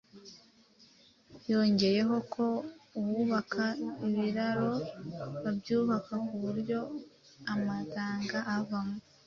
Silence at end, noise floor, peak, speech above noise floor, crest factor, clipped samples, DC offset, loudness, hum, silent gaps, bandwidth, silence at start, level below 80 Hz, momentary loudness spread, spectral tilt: 0.25 s; -62 dBFS; -14 dBFS; 30 dB; 20 dB; under 0.1%; under 0.1%; -33 LUFS; none; none; 7 kHz; 0.15 s; -70 dBFS; 14 LU; -6.5 dB/octave